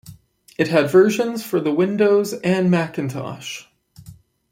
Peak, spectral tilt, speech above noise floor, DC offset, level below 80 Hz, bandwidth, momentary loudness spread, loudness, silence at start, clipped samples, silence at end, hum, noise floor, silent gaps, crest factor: -2 dBFS; -6 dB/octave; 27 dB; under 0.1%; -60 dBFS; 16.5 kHz; 16 LU; -19 LUFS; 0.05 s; under 0.1%; 0.4 s; none; -45 dBFS; none; 16 dB